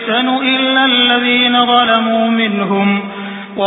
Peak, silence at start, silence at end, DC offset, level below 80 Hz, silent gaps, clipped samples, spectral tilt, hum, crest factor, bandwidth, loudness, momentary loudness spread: 0 dBFS; 0 s; 0 s; under 0.1%; -62 dBFS; none; under 0.1%; -8 dB/octave; none; 12 dB; 4 kHz; -11 LUFS; 8 LU